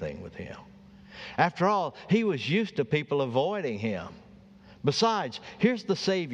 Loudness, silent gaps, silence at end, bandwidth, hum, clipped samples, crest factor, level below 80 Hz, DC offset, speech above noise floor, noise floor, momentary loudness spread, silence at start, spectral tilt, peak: -28 LUFS; none; 0 s; 9.6 kHz; none; under 0.1%; 22 dB; -62 dBFS; under 0.1%; 25 dB; -52 dBFS; 16 LU; 0 s; -5.5 dB/octave; -6 dBFS